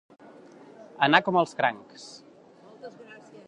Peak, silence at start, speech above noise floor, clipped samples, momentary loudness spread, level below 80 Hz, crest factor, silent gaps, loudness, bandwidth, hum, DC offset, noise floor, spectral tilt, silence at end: -2 dBFS; 1 s; 28 dB; under 0.1%; 26 LU; -78 dBFS; 26 dB; none; -24 LUFS; 10.5 kHz; none; under 0.1%; -53 dBFS; -5 dB/octave; 0.35 s